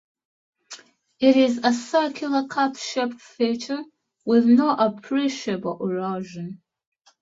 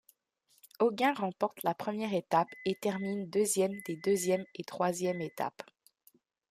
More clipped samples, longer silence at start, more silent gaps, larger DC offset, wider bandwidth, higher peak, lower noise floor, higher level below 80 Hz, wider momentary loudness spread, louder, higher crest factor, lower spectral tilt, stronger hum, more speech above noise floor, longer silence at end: neither; about the same, 0.7 s vs 0.8 s; neither; neither; second, 7.8 kHz vs 15.5 kHz; first, -4 dBFS vs -14 dBFS; second, -46 dBFS vs -72 dBFS; first, -70 dBFS vs -78 dBFS; first, 17 LU vs 8 LU; first, -22 LUFS vs -32 LUFS; about the same, 18 dB vs 20 dB; about the same, -5 dB/octave vs -4.5 dB/octave; neither; second, 24 dB vs 40 dB; second, 0.65 s vs 0.9 s